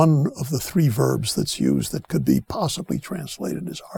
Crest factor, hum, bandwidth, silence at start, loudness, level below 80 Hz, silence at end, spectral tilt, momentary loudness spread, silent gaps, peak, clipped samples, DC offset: 20 dB; none; 19.5 kHz; 0 s; -23 LUFS; -48 dBFS; 0 s; -6 dB/octave; 9 LU; none; -2 dBFS; under 0.1%; under 0.1%